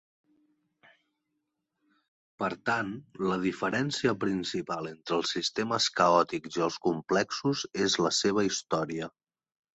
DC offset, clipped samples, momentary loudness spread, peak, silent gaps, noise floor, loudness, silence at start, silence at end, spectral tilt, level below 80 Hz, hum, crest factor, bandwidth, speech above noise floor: under 0.1%; under 0.1%; 9 LU; -10 dBFS; none; -82 dBFS; -29 LUFS; 2.4 s; 0.65 s; -4 dB/octave; -68 dBFS; none; 22 dB; 8.4 kHz; 53 dB